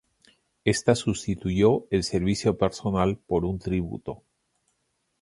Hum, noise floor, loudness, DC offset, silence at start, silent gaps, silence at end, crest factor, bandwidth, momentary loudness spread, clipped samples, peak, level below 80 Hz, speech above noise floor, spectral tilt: none; -75 dBFS; -25 LUFS; under 0.1%; 0.65 s; none; 1.05 s; 22 dB; 11.5 kHz; 8 LU; under 0.1%; -6 dBFS; -46 dBFS; 50 dB; -6 dB/octave